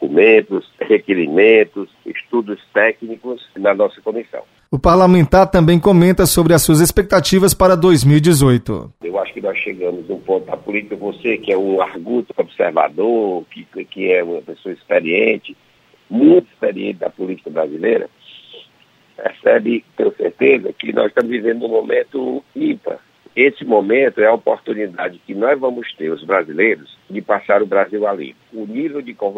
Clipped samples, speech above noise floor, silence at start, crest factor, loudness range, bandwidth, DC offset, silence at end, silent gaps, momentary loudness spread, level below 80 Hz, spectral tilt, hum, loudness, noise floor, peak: under 0.1%; 38 dB; 0 s; 14 dB; 8 LU; 16 kHz; under 0.1%; 0 s; none; 15 LU; -38 dBFS; -5.5 dB/octave; none; -15 LUFS; -53 dBFS; 0 dBFS